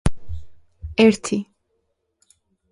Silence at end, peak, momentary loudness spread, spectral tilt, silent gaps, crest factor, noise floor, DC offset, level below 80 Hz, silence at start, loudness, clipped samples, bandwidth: 1.3 s; -2 dBFS; 23 LU; -5.5 dB/octave; none; 20 dB; -72 dBFS; under 0.1%; -36 dBFS; 0.05 s; -20 LUFS; under 0.1%; 11.5 kHz